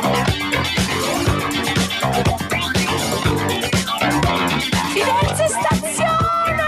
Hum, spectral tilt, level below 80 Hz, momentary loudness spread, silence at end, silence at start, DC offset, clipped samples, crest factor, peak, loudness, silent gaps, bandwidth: none; -4 dB/octave; -34 dBFS; 2 LU; 0 s; 0 s; under 0.1%; under 0.1%; 16 dB; -2 dBFS; -18 LUFS; none; 15.5 kHz